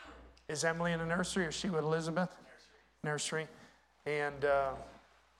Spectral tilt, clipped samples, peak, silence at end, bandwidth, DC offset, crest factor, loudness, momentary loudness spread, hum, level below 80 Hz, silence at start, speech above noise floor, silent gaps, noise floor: -4.5 dB/octave; under 0.1%; -20 dBFS; 0.4 s; 13.5 kHz; under 0.1%; 18 dB; -36 LUFS; 15 LU; none; -62 dBFS; 0 s; 29 dB; none; -64 dBFS